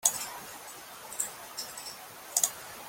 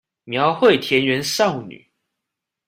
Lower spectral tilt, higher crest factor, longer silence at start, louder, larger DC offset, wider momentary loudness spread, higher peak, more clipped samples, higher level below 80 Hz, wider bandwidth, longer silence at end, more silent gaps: second, 1 dB/octave vs -4 dB/octave; first, 30 dB vs 18 dB; second, 0 s vs 0.25 s; second, -33 LUFS vs -18 LUFS; neither; about the same, 16 LU vs 14 LU; second, -6 dBFS vs -2 dBFS; neither; second, -72 dBFS vs -60 dBFS; about the same, 17 kHz vs 16 kHz; second, 0 s vs 0.95 s; neither